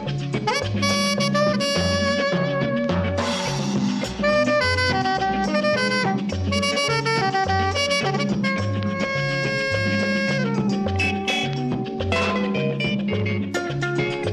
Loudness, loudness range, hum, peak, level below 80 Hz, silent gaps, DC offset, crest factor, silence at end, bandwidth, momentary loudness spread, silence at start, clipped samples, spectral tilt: -22 LUFS; 2 LU; none; -8 dBFS; -46 dBFS; none; under 0.1%; 14 dB; 0 s; 12.5 kHz; 4 LU; 0 s; under 0.1%; -5 dB/octave